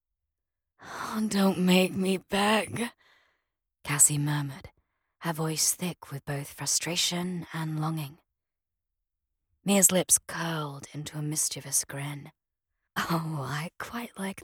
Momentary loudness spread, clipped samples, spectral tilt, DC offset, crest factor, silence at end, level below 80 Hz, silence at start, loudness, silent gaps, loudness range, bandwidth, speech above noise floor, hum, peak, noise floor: 17 LU; under 0.1%; -3.5 dB/octave; under 0.1%; 26 dB; 0 s; -66 dBFS; 0.8 s; -27 LUFS; none; 5 LU; 18 kHz; 60 dB; none; -4 dBFS; -89 dBFS